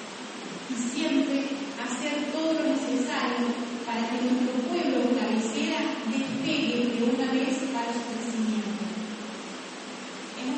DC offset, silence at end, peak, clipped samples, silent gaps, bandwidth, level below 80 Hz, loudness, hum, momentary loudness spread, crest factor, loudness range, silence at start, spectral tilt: under 0.1%; 0 s; -12 dBFS; under 0.1%; none; 8.8 kHz; -72 dBFS; -28 LUFS; none; 12 LU; 16 dB; 2 LU; 0 s; -4 dB/octave